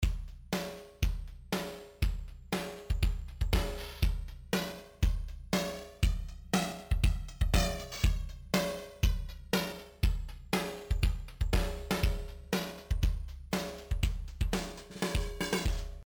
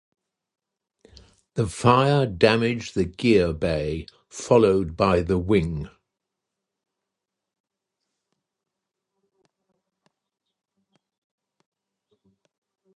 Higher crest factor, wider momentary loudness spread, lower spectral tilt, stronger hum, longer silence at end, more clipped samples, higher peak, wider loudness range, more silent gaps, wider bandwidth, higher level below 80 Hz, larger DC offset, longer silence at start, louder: second, 16 dB vs 24 dB; second, 7 LU vs 16 LU; second, -5 dB/octave vs -6.5 dB/octave; neither; second, 0 s vs 7.1 s; neither; second, -16 dBFS vs -2 dBFS; second, 3 LU vs 8 LU; neither; first, over 20 kHz vs 11.5 kHz; first, -34 dBFS vs -46 dBFS; neither; second, 0 s vs 1.55 s; second, -35 LUFS vs -21 LUFS